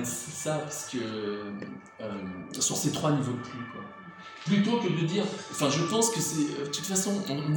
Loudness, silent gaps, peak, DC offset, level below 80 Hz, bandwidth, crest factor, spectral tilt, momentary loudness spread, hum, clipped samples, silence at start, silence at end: -29 LUFS; none; -10 dBFS; under 0.1%; -70 dBFS; 17.5 kHz; 20 dB; -4 dB/octave; 15 LU; none; under 0.1%; 0 s; 0 s